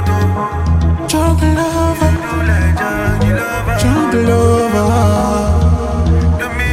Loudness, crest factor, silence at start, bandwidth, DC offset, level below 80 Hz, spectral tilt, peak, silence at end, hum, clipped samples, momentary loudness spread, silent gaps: -14 LUFS; 12 dB; 0 s; 15 kHz; under 0.1%; -22 dBFS; -6.5 dB/octave; 0 dBFS; 0 s; none; under 0.1%; 4 LU; none